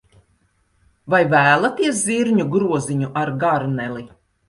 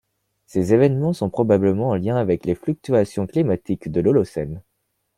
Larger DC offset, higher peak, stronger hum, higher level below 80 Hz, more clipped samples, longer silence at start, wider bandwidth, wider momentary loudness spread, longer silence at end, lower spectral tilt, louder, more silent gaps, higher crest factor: neither; about the same, -2 dBFS vs -4 dBFS; neither; about the same, -56 dBFS vs -52 dBFS; neither; first, 1.05 s vs 0.55 s; second, 11.5 kHz vs 14 kHz; about the same, 10 LU vs 9 LU; second, 0.4 s vs 0.55 s; second, -5 dB/octave vs -8.5 dB/octave; about the same, -18 LUFS vs -20 LUFS; neither; about the same, 18 dB vs 16 dB